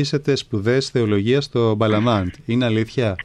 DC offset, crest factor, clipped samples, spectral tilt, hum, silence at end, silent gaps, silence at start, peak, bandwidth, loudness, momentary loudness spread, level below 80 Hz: under 0.1%; 12 dB; under 0.1%; -6.5 dB/octave; none; 0 s; none; 0 s; -6 dBFS; 10.5 kHz; -19 LUFS; 4 LU; -50 dBFS